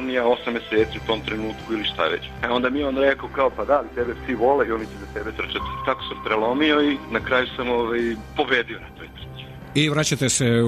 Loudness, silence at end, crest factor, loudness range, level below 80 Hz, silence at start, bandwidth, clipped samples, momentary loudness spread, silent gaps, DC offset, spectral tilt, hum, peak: -22 LUFS; 0 s; 16 dB; 2 LU; -44 dBFS; 0 s; 13.5 kHz; under 0.1%; 11 LU; none; under 0.1%; -4 dB/octave; none; -6 dBFS